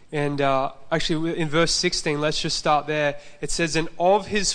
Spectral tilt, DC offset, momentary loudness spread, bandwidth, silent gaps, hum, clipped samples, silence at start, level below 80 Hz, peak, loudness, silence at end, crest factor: -3.5 dB/octave; under 0.1%; 6 LU; 10 kHz; none; none; under 0.1%; 0 s; -40 dBFS; -6 dBFS; -23 LUFS; 0 s; 16 dB